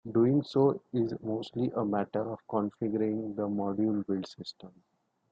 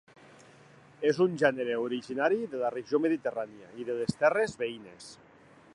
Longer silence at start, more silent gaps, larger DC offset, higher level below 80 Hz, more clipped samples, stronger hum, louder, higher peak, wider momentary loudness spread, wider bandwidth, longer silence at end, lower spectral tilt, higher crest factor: second, 0.05 s vs 1 s; neither; neither; about the same, -72 dBFS vs -70 dBFS; neither; neither; about the same, -31 LUFS vs -30 LUFS; second, -14 dBFS vs -10 dBFS; second, 9 LU vs 15 LU; second, 7.8 kHz vs 11 kHz; about the same, 0.6 s vs 0.6 s; first, -8.5 dB/octave vs -6 dB/octave; second, 16 dB vs 22 dB